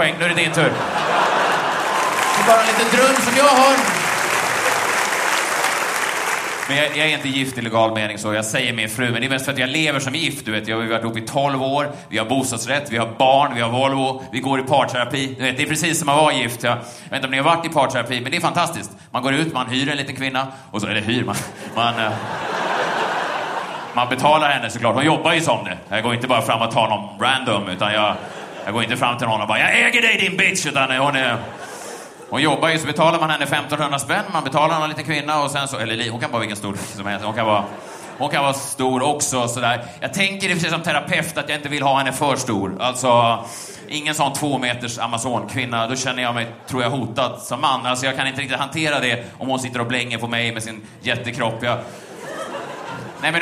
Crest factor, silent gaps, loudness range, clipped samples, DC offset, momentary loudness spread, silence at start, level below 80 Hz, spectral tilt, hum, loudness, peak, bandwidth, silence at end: 20 dB; none; 6 LU; under 0.1%; under 0.1%; 10 LU; 0 s; -60 dBFS; -3.5 dB/octave; none; -19 LUFS; 0 dBFS; 15.5 kHz; 0 s